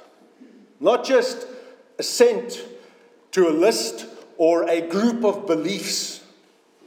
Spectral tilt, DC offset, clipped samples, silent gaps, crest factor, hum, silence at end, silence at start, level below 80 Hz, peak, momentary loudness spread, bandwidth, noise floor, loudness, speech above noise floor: -3.5 dB/octave; under 0.1%; under 0.1%; none; 20 dB; none; 0.7 s; 0.8 s; under -90 dBFS; -2 dBFS; 19 LU; 17 kHz; -56 dBFS; -21 LUFS; 36 dB